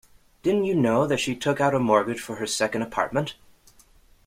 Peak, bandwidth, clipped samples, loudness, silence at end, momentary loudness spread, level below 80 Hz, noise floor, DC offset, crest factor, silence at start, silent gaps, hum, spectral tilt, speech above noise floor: -6 dBFS; 16 kHz; under 0.1%; -24 LUFS; 0.95 s; 8 LU; -58 dBFS; -56 dBFS; under 0.1%; 20 dB; 0.45 s; none; none; -5 dB/octave; 32 dB